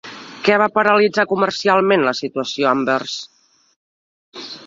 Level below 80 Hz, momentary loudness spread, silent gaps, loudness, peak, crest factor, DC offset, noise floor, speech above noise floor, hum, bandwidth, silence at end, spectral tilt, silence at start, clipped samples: -62 dBFS; 14 LU; 3.76-4.32 s; -17 LUFS; 0 dBFS; 18 dB; under 0.1%; under -90 dBFS; over 73 dB; none; 7.8 kHz; 0 s; -4.5 dB/octave; 0.05 s; under 0.1%